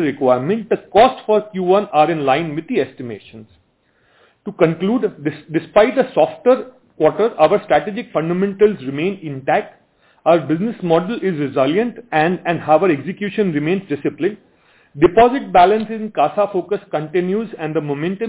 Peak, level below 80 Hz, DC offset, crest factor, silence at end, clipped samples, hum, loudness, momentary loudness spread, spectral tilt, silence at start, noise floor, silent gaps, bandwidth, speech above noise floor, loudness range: 0 dBFS; -54 dBFS; under 0.1%; 16 dB; 0 s; under 0.1%; none; -17 LUFS; 9 LU; -10.5 dB/octave; 0 s; -60 dBFS; none; 4 kHz; 43 dB; 3 LU